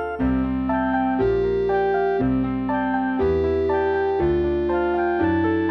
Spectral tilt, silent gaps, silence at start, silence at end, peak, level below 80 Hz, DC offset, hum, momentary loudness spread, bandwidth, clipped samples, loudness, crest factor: -9.5 dB/octave; none; 0 s; 0 s; -10 dBFS; -36 dBFS; under 0.1%; none; 2 LU; 5.8 kHz; under 0.1%; -21 LUFS; 12 dB